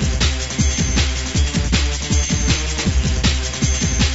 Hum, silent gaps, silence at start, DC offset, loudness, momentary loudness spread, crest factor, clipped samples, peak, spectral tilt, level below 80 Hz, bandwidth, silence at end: none; none; 0 s; under 0.1%; -18 LUFS; 2 LU; 14 dB; under 0.1%; -4 dBFS; -3.5 dB/octave; -20 dBFS; 8 kHz; 0 s